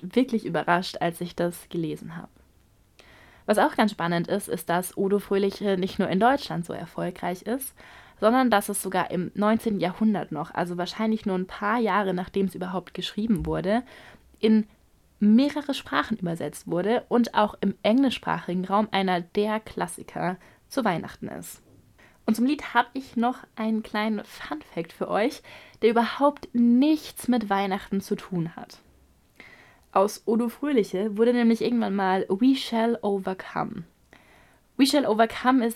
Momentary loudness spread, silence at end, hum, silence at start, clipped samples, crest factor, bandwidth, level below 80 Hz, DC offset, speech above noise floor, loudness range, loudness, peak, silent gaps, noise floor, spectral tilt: 11 LU; 0 s; none; 0 s; under 0.1%; 20 dB; 16 kHz; -56 dBFS; under 0.1%; 35 dB; 4 LU; -25 LUFS; -6 dBFS; none; -60 dBFS; -5.5 dB/octave